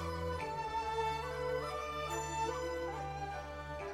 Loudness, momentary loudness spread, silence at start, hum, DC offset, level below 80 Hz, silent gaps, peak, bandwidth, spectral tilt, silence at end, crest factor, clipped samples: -39 LUFS; 6 LU; 0 s; none; under 0.1%; -52 dBFS; none; -24 dBFS; 17 kHz; -4.5 dB/octave; 0 s; 14 dB; under 0.1%